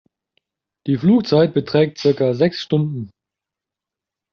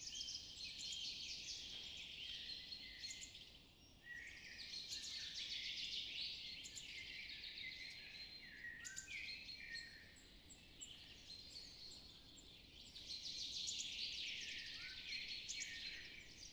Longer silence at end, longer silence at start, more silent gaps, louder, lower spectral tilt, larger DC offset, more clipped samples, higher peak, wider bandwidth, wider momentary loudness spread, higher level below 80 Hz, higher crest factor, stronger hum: first, 1.25 s vs 0 s; first, 0.85 s vs 0 s; neither; first, -17 LUFS vs -49 LUFS; first, -6.5 dB/octave vs 0.5 dB/octave; neither; neither; first, -4 dBFS vs -34 dBFS; second, 6.8 kHz vs over 20 kHz; about the same, 13 LU vs 13 LU; first, -60 dBFS vs -72 dBFS; about the same, 16 dB vs 18 dB; neither